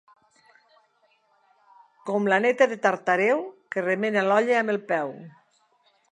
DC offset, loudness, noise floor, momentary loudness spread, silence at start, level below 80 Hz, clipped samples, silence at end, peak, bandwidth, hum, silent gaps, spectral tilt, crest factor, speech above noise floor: under 0.1%; -23 LUFS; -66 dBFS; 10 LU; 2.05 s; -82 dBFS; under 0.1%; 0.8 s; -6 dBFS; 11 kHz; none; none; -5.5 dB/octave; 20 dB; 43 dB